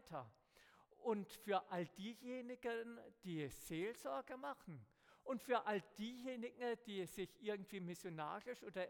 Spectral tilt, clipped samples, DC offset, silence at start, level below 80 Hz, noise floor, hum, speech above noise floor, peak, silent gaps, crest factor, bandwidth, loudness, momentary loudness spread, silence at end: -5 dB/octave; under 0.1%; under 0.1%; 0.05 s; -78 dBFS; -71 dBFS; none; 24 dB; -26 dBFS; none; 20 dB; 18 kHz; -47 LUFS; 11 LU; 0 s